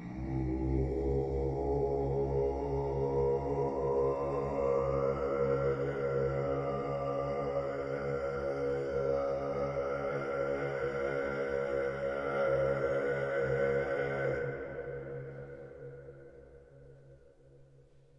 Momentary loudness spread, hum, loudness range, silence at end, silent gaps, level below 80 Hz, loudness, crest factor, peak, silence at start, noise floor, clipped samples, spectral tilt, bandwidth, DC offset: 9 LU; none; 5 LU; 0.55 s; none; -48 dBFS; -34 LUFS; 14 dB; -20 dBFS; 0 s; -60 dBFS; under 0.1%; -8.5 dB/octave; 8 kHz; under 0.1%